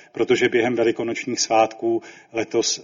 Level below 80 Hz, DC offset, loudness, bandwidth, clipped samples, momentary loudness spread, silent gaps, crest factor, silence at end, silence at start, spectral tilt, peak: -64 dBFS; under 0.1%; -21 LUFS; 7.6 kHz; under 0.1%; 8 LU; none; 16 dB; 0 s; 0.15 s; -3 dB/octave; -6 dBFS